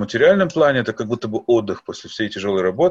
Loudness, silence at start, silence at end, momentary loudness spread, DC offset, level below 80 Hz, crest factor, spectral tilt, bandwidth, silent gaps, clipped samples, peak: -19 LUFS; 0 s; 0 s; 12 LU; under 0.1%; -56 dBFS; 16 dB; -6 dB/octave; 7.8 kHz; none; under 0.1%; -2 dBFS